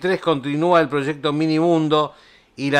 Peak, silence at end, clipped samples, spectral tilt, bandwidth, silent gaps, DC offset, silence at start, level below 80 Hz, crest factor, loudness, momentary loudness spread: -4 dBFS; 0 s; under 0.1%; -6.5 dB/octave; 10 kHz; none; under 0.1%; 0 s; -64 dBFS; 16 dB; -19 LUFS; 6 LU